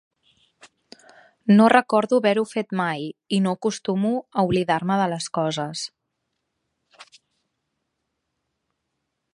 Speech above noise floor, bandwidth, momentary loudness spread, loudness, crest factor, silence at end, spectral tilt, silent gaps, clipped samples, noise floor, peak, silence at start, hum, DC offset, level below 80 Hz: 57 dB; 11 kHz; 12 LU; -22 LUFS; 22 dB; 2.3 s; -5.5 dB/octave; none; under 0.1%; -78 dBFS; -2 dBFS; 1.45 s; none; under 0.1%; -62 dBFS